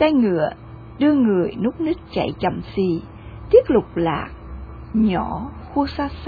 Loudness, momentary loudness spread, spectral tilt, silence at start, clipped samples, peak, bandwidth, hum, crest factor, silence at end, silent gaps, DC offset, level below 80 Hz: -20 LUFS; 20 LU; -9.5 dB/octave; 0 s; under 0.1%; -2 dBFS; 4.9 kHz; none; 18 dB; 0 s; none; under 0.1%; -40 dBFS